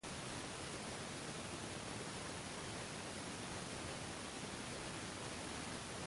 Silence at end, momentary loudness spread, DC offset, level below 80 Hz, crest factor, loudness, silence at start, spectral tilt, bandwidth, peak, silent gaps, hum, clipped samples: 0 s; 1 LU; under 0.1%; -64 dBFS; 14 dB; -46 LUFS; 0.05 s; -3 dB/octave; 11.5 kHz; -32 dBFS; none; none; under 0.1%